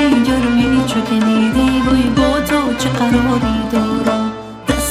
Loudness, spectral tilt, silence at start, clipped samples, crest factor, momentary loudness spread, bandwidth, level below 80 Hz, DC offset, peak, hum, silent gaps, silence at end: -15 LUFS; -5 dB/octave; 0 s; under 0.1%; 14 dB; 4 LU; 15 kHz; -30 dBFS; under 0.1%; 0 dBFS; none; none; 0 s